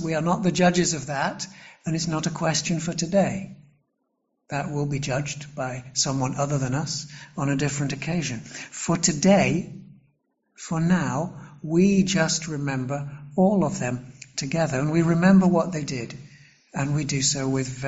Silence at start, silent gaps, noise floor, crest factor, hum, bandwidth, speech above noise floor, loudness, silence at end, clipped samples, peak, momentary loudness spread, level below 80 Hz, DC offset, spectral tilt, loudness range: 0 s; none; -75 dBFS; 18 dB; none; 8 kHz; 51 dB; -24 LUFS; 0 s; under 0.1%; -6 dBFS; 14 LU; -54 dBFS; under 0.1%; -5 dB/octave; 5 LU